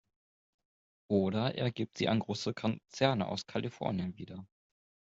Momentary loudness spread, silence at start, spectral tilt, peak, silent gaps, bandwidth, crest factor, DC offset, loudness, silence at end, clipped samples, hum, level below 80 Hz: 9 LU; 1.1 s; -6 dB/octave; -14 dBFS; none; 7.8 kHz; 22 dB; under 0.1%; -34 LUFS; 0.7 s; under 0.1%; none; -70 dBFS